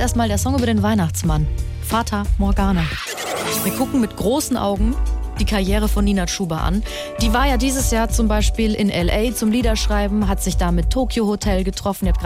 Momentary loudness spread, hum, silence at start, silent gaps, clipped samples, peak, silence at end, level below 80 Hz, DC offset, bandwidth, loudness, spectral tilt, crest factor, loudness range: 4 LU; none; 0 s; none; under 0.1%; -6 dBFS; 0 s; -22 dBFS; under 0.1%; 16.5 kHz; -19 LUFS; -5 dB/octave; 12 dB; 2 LU